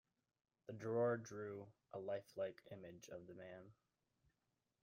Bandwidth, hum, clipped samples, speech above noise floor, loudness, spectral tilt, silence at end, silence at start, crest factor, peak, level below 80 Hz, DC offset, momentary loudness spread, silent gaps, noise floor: 15.5 kHz; none; under 0.1%; 42 dB; -48 LUFS; -6.5 dB/octave; 1.1 s; 0.7 s; 18 dB; -32 dBFS; -86 dBFS; under 0.1%; 17 LU; none; -89 dBFS